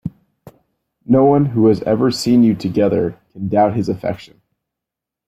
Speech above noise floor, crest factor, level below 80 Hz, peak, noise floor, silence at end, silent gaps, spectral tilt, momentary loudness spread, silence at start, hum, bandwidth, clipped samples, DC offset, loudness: 69 dB; 14 dB; -52 dBFS; -2 dBFS; -84 dBFS; 1.05 s; none; -7.5 dB/octave; 12 LU; 0.05 s; none; 13.5 kHz; under 0.1%; under 0.1%; -16 LUFS